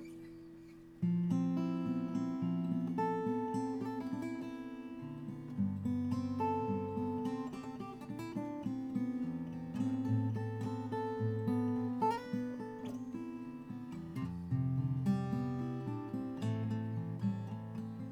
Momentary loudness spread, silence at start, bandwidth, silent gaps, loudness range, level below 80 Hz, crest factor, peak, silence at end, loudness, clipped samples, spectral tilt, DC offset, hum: 10 LU; 0 s; 12.5 kHz; none; 3 LU; -68 dBFS; 16 dB; -22 dBFS; 0 s; -38 LUFS; under 0.1%; -9 dB/octave; under 0.1%; none